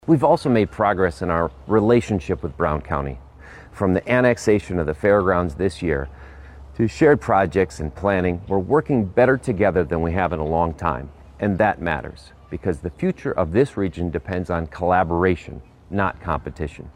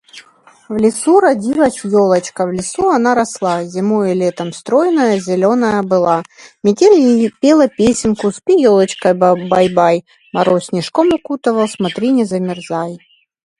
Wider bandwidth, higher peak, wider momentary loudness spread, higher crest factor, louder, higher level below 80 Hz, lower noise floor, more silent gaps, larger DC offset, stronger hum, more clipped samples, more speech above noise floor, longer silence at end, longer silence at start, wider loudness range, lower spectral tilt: about the same, 11.5 kHz vs 11.5 kHz; second, -4 dBFS vs 0 dBFS; first, 11 LU vs 8 LU; about the same, 16 dB vs 14 dB; second, -21 LUFS vs -14 LUFS; first, -38 dBFS vs -50 dBFS; second, -42 dBFS vs -46 dBFS; neither; neither; neither; neither; second, 22 dB vs 33 dB; second, 0.05 s vs 0.65 s; about the same, 0.05 s vs 0.15 s; about the same, 4 LU vs 3 LU; first, -7.5 dB/octave vs -5.5 dB/octave